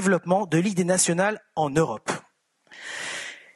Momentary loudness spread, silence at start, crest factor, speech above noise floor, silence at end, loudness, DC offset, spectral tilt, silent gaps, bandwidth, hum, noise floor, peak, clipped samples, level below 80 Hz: 13 LU; 0 s; 18 dB; 40 dB; 0.15 s; -24 LUFS; under 0.1%; -4.5 dB/octave; none; 12 kHz; none; -63 dBFS; -8 dBFS; under 0.1%; -62 dBFS